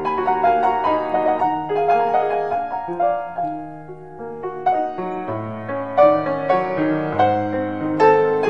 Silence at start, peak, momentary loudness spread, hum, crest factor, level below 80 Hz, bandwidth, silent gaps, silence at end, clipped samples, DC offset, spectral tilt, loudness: 0 s; -2 dBFS; 12 LU; none; 18 dB; -56 dBFS; 7.2 kHz; none; 0 s; under 0.1%; 0.5%; -8 dB/octave; -20 LUFS